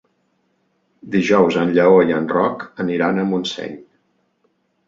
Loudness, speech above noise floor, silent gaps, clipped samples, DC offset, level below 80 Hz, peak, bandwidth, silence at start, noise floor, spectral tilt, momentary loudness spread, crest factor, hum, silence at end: -17 LUFS; 49 dB; none; under 0.1%; under 0.1%; -58 dBFS; -2 dBFS; 7.6 kHz; 1.05 s; -65 dBFS; -6.5 dB/octave; 13 LU; 16 dB; none; 1.05 s